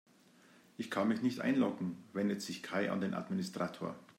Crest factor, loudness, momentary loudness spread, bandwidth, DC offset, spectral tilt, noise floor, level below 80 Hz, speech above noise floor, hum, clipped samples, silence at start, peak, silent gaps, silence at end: 18 dB; -37 LUFS; 9 LU; 16 kHz; under 0.1%; -6 dB/octave; -64 dBFS; -82 dBFS; 28 dB; none; under 0.1%; 0.8 s; -20 dBFS; none; 0.05 s